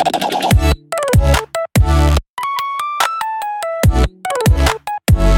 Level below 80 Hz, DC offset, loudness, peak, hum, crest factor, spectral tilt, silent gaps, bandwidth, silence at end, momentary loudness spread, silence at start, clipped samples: -18 dBFS; under 0.1%; -16 LUFS; 0 dBFS; none; 14 dB; -5.5 dB/octave; 2.29-2.37 s; 17 kHz; 0 s; 7 LU; 0 s; under 0.1%